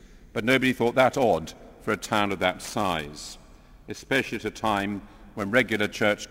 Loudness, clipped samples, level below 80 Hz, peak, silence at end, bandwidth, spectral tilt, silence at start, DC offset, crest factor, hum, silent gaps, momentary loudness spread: -25 LUFS; under 0.1%; -52 dBFS; -6 dBFS; 0.05 s; 16 kHz; -4.5 dB/octave; 0.05 s; under 0.1%; 20 dB; none; none; 17 LU